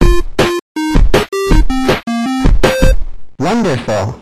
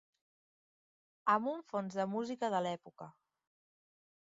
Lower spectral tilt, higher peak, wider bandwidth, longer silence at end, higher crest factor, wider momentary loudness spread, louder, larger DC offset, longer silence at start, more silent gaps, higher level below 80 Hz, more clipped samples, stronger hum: about the same, -5.5 dB/octave vs -4.5 dB/octave; first, 0 dBFS vs -18 dBFS; first, 14 kHz vs 7.6 kHz; second, 0 s vs 1.1 s; second, 10 dB vs 22 dB; second, 5 LU vs 20 LU; first, -14 LUFS vs -37 LUFS; neither; second, 0 s vs 1.25 s; first, 0.62-0.75 s vs none; first, -14 dBFS vs -84 dBFS; neither; neither